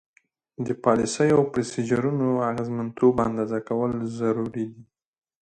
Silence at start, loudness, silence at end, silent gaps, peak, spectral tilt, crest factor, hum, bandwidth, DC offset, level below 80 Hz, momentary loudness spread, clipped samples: 0.6 s; -24 LUFS; 0.6 s; none; -4 dBFS; -6.5 dB/octave; 20 dB; none; 9.6 kHz; under 0.1%; -58 dBFS; 10 LU; under 0.1%